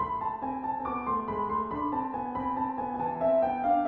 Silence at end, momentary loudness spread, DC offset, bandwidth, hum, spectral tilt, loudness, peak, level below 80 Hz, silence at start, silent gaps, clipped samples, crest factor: 0 s; 6 LU; under 0.1%; 4.3 kHz; none; -6.5 dB/octave; -30 LUFS; -16 dBFS; -56 dBFS; 0 s; none; under 0.1%; 14 dB